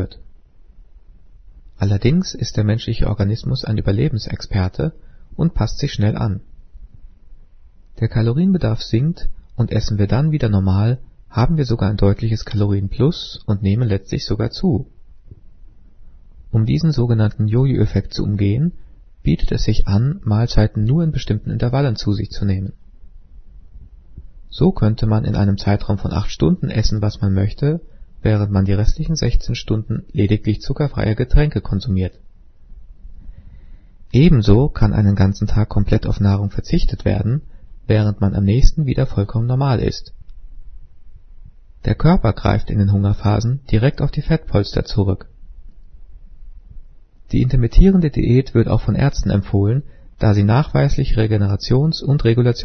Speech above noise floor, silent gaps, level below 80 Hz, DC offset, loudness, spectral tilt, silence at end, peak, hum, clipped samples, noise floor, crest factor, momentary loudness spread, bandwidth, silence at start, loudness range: 27 dB; none; -26 dBFS; under 0.1%; -18 LUFS; -8 dB/octave; 0 s; 0 dBFS; none; under 0.1%; -43 dBFS; 18 dB; 7 LU; 6.4 kHz; 0 s; 5 LU